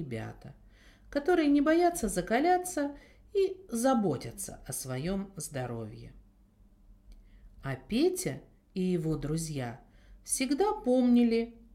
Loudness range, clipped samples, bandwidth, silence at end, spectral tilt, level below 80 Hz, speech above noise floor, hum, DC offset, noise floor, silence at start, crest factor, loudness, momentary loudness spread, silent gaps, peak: 10 LU; under 0.1%; 16.5 kHz; 0.15 s; -5 dB/octave; -54 dBFS; 31 dB; none; under 0.1%; -61 dBFS; 0 s; 18 dB; -30 LUFS; 16 LU; none; -14 dBFS